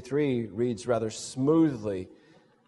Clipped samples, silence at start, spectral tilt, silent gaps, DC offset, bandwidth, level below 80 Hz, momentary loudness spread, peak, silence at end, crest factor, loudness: under 0.1%; 0 s; -6.5 dB/octave; none; under 0.1%; 11.5 kHz; -66 dBFS; 11 LU; -12 dBFS; 0.55 s; 16 dB; -28 LUFS